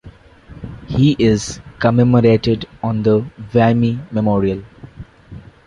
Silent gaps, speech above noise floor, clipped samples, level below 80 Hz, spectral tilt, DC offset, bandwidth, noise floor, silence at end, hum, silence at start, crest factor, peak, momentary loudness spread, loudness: none; 27 dB; under 0.1%; -40 dBFS; -7 dB/octave; under 0.1%; 10.5 kHz; -41 dBFS; 0.25 s; none; 0.05 s; 14 dB; -2 dBFS; 15 LU; -16 LUFS